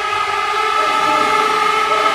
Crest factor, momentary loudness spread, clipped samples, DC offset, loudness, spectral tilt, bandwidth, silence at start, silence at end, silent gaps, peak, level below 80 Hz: 14 dB; 3 LU; under 0.1%; under 0.1%; -15 LUFS; -1.5 dB/octave; 16 kHz; 0 s; 0 s; none; -2 dBFS; -52 dBFS